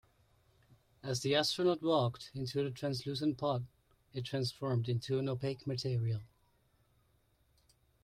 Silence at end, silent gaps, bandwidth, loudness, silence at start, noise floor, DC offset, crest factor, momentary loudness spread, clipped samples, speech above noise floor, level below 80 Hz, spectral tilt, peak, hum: 1.75 s; none; 15 kHz; -36 LUFS; 1.05 s; -73 dBFS; under 0.1%; 18 dB; 10 LU; under 0.1%; 38 dB; -68 dBFS; -6 dB/octave; -18 dBFS; none